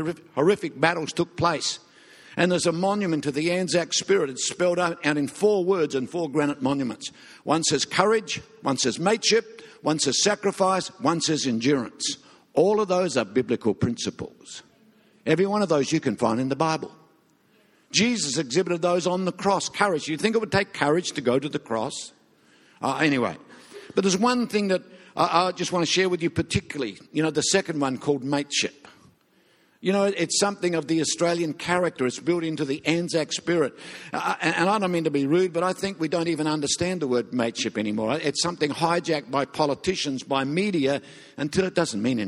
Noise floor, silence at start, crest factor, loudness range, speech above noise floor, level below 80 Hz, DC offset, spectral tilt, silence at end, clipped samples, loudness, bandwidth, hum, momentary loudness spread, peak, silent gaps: -62 dBFS; 0 s; 22 dB; 2 LU; 37 dB; -60 dBFS; under 0.1%; -4 dB/octave; 0 s; under 0.1%; -24 LUFS; 12.5 kHz; none; 7 LU; -2 dBFS; none